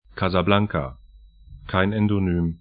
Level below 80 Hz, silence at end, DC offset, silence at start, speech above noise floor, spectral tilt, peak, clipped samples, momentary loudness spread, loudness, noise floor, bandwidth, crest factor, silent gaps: -42 dBFS; 0.05 s; under 0.1%; 0.15 s; 27 dB; -11.5 dB/octave; -2 dBFS; under 0.1%; 10 LU; -22 LUFS; -48 dBFS; 5 kHz; 22 dB; none